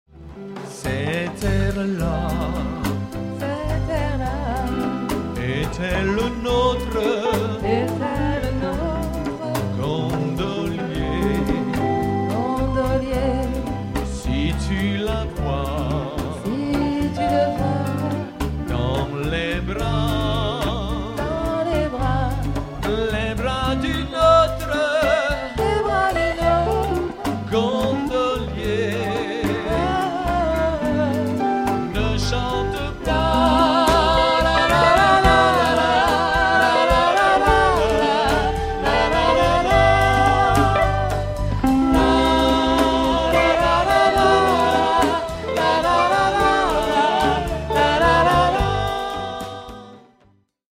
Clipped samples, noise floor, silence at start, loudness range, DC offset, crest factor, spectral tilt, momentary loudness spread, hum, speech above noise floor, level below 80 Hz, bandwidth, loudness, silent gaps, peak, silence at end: under 0.1%; -58 dBFS; 0.15 s; 7 LU; under 0.1%; 18 dB; -5.5 dB/octave; 9 LU; none; 37 dB; -30 dBFS; 16 kHz; -20 LUFS; none; 0 dBFS; 0.75 s